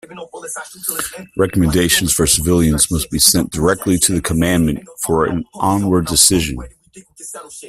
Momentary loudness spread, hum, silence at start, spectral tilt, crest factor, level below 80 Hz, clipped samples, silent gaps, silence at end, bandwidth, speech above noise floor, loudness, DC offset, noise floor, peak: 16 LU; none; 0.1 s; -3.5 dB/octave; 16 dB; -34 dBFS; under 0.1%; none; 0 s; 16 kHz; 24 dB; -15 LUFS; under 0.1%; -40 dBFS; 0 dBFS